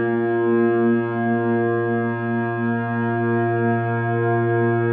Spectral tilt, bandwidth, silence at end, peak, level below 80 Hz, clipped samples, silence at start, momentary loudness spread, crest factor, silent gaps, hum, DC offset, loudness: -13 dB/octave; 3.7 kHz; 0 s; -10 dBFS; -68 dBFS; under 0.1%; 0 s; 4 LU; 10 dB; none; none; under 0.1%; -21 LUFS